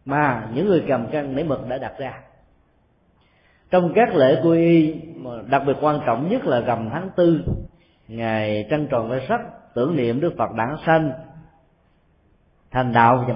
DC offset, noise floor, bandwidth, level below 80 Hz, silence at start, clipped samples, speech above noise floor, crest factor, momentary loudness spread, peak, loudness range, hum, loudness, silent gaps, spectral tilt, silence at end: under 0.1%; -60 dBFS; 5.4 kHz; -46 dBFS; 0.05 s; under 0.1%; 41 dB; 20 dB; 13 LU; -2 dBFS; 5 LU; none; -20 LUFS; none; -12 dB/octave; 0 s